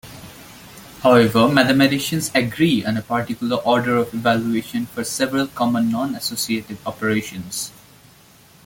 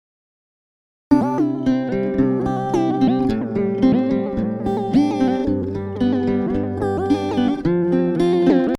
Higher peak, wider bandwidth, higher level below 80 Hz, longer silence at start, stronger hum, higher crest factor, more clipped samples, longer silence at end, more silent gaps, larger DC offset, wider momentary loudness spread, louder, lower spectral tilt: about the same, -2 dBFS vs -4 dBFS; first, 17 kHz vs 10.5 kHz; second, -54 dBFS vs -42 dBFS; second, 0.05 s vs 1.1 s; neither; about the same, 18 dB vs 16 dB; neither; first, 0.95 s vs 0 s; neither; neither; first, 16 LU vs 5 LU; about the same, -19 LUFS vs -19 LUFS; second, -4.5 dB/octave vs -8 dB/octave